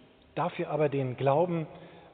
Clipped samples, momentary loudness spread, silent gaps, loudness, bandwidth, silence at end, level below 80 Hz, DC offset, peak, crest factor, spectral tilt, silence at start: under 0.1%; 15 LU; none; -30 LUFS; 4.5 kHz; 0.05 s; -68 dBFS; under 0.1%; -12 dBFS; 18 dB; -6.5 dB/octave; 0.35 s